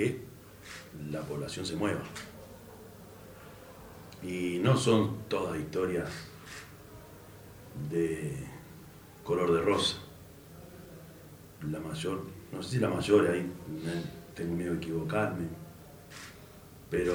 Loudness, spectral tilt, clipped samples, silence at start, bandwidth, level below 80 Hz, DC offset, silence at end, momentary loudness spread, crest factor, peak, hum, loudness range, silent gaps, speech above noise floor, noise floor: -32 LUFS; -5.5 dB/octave; under 0.1%; 0 s; over 20 kHz; -60 dBFS; under 0.1%; 0 s; 23 LU; 22 dB; -12 dBFS; none; 7 LU; none; 20 dB; -51 dBFS